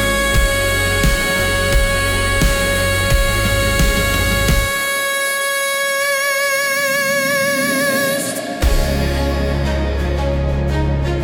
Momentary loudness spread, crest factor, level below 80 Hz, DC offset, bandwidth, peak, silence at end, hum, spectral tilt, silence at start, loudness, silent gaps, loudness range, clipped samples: 4 LU; 12 dB; -22 dBFS; under 0.1%; 18 kHz; -4 dBFS; 0 s; none; -3.5 dB/octave; 0 s; -16 LUFS; none; 2 LU; under 0.1%